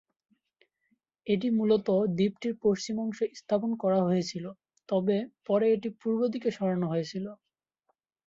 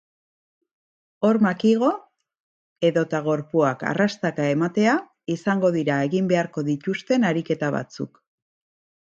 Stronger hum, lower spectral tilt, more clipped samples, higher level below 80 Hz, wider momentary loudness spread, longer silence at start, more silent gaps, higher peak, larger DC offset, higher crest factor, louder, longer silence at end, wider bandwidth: neither; about the same, -7 dB/octave vs -6.5 dB/octave; neither; about the same, -70 dBFS vs -70 dBFS; first, 10 LU vs 7 LU; about the same, 1.25 s vs 1.2 s; second, none vs 2.40-2.76 s; second, -14 dBFS vs -6 dBFS; neither; about the same, 16 dB vs 18 dB; second, -29 LUFS vs -22 LUFS; about the same, 0.95 s vs 1 s; about the same, 7.8 kHz vs 7.6 kHz